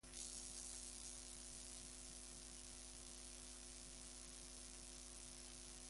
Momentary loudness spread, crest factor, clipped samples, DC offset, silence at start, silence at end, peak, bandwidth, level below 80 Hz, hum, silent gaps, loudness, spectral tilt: 4 LU; 24 dB; under 0.1%; under 0.1%; 0.05 s; 0 s; -32 dBFS; 11.5 kHz; -64 dBFS; none; none; -54 LUFS; -1.5 dB/octave